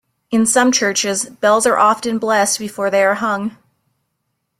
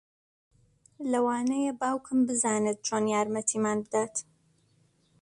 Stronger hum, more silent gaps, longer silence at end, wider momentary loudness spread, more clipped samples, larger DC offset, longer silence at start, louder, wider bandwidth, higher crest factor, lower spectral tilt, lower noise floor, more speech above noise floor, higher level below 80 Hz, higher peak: neither; neither; about the same, 1.05 s vs 1 s; about the same, 7 LU vs 5 LU; neither; neither; second, 0.3 s vs 1 s; first, -15 LUFS vs -28 LUFS; first, 15.5 kHz vs 11.5 kHz; about the same, 16 dB vs 16 dB; second, -2.5 dB/octave vs -4 dB/octave; first, -72 dBFS vs -67 dBFS; first, 56 dB vs 39 dB; first, -62 dBFS vs -72 dBFS; first, -2 dBFS vs -14 dBFS